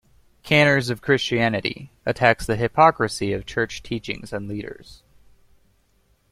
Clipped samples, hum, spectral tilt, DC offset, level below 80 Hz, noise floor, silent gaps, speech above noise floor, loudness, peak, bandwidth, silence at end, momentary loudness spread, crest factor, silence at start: under 0.1%; none; -5 dB/octave; under 0.1%; -48 dBFS; -63 dBFS; none; 41 dB; -21 LUFS; -2 dBFS; 15.5 kHz; 1.5 s; 14 LU; 22 dB; 0.45 s